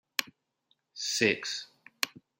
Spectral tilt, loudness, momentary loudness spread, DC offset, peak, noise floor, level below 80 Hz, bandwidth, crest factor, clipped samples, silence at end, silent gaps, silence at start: -2 dB/octave; -31 LUFS; 17 LU; under 0.1%; -6 dBFS; -75 dBFS; -80 dBFS; 16 kHz; 28 dB; under 0.1%; 0.3 s; none; 0.2 s